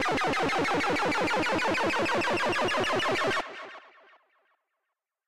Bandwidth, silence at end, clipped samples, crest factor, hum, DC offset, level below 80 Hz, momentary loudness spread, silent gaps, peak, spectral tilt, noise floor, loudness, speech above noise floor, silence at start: 16 kHz; 0 s; under 0.1%; 12 dB; none; under 0.1%; -58 dBFS; 4 LU; none; -16 dBFS; -3.5 dB/octave; -85 dBFS; -27 LUFS; 57 dB; 0 s